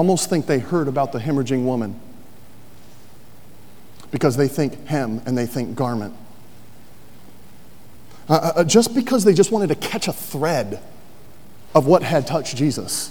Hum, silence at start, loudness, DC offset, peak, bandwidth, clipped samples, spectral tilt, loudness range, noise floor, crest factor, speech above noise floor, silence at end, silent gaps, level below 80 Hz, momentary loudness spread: none; 0 s; -20 LUFS; 2%; 0 dBFS; over 20 kHz; under 0.1%; -5.5 dB/octave; 8 LU; -47 dBFS; 20 dB; 28 dB; 0 s; none; -58 dBFS; 10 LU